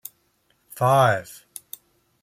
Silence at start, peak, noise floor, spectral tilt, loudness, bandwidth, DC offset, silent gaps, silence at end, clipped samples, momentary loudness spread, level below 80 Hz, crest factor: 0.75 s; -6 dBFS; -67 dBFS; -5 dB/octave; -20 LUFS; 16.5 kHz; under 0.1%; none; 0.9 s; under 0.1%; 24 LU; -66 dBFS; 18 dB